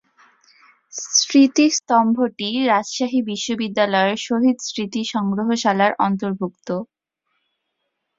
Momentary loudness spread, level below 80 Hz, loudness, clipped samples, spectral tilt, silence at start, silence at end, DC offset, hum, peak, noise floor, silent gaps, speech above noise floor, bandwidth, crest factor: 12 LU; -66 dBFS; -19 LUFS; under 0.1%; -3.5 dB/octave; 0.95 s; 1.35 s; under 0.1%; none; -2 dBFS; -75 dBFS; none; 57 dB; 7.8 kHz; 18 dB